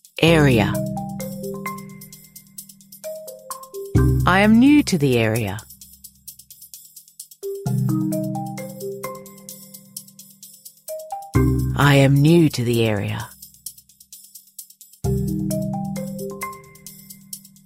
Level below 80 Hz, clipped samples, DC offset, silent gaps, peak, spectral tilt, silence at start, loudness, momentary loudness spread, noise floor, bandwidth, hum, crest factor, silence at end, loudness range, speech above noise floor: -38 dBFS; under 0.1%; under 0.1%; none; -2 dBFS; -6 dB/octave; 0.15 s; -19 LUFS; 26 LU; -46 dBFS; 16 kHz; none; 20 dB; 0.3 s; 10 LU; 31 dB